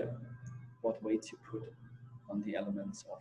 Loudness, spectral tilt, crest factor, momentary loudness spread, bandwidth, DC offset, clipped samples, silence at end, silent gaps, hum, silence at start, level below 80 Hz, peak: -41 LUFS; -6.5 dB/octave; 18 dB; 15 LU; 11 kHz; under 0.1%; under 0.1%; 0 s; none; none; 0 s; -72 dBFS; -22 dBFS